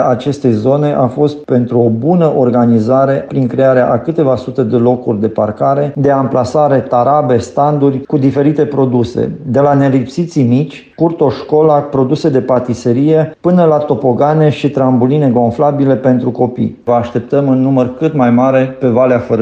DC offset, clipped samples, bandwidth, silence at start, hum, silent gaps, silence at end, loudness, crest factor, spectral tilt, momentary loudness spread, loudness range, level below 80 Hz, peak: under 0.1%; under 0.1%; 8.2 kHz; 0 s; none; none; 0 s; -11 LUFS; 10 dB; -9 dB/octave; 5 LU; 1 LU; -48 dBFS; 0 dBFS